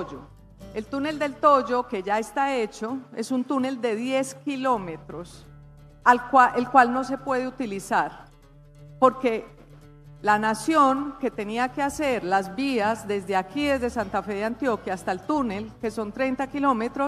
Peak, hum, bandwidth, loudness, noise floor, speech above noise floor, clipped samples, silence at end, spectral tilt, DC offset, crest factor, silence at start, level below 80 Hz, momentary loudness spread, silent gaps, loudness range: -2 dBFS; none; 14.5 kHz; -24 LUFS; -51 dBFS; 26 dB; under 0.1%; 0 s; -5 dB/octave; under 0.1%; 22 dB; 0 s; -54 dBFS; 13 LU; none; 5 LU